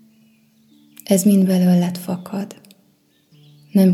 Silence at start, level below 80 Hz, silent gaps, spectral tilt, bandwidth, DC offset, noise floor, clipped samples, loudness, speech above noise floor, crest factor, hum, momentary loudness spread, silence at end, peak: 1.1 s; -72 dBFS; none; -7 dB/octave; 15.5 kHz; under 0.1%; -59 dBFS; under 0.1%; -18 LUFS; 42 dB; 16 dB; none; 15 LU; 0 s; -2 dBFS